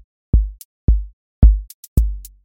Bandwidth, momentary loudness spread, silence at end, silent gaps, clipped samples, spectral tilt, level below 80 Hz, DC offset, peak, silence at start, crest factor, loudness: 16 kHz; 10 LU; 0.2 s; 0.65-0.88 s, 1.13-1.42 s, 1.74-1.96 s; under 0.1%; -8.5 dB/octave; -18 dBFS; under 0.1%; 0 dBFS; 0.35 s; 16 dB; -20 LUFS